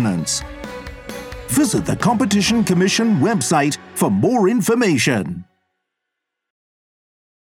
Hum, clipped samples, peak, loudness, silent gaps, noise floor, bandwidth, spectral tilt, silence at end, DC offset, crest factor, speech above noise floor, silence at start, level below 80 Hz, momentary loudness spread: none; under 0.1%; -2 dBFS; -17 LUFS; none; -80 dBFS; 18.5 kHz; -4.5 dB/octave; 2.1 s; under 0.1%; 16 dB; 63 dB; 0 s; -44 dBFS; 16 LU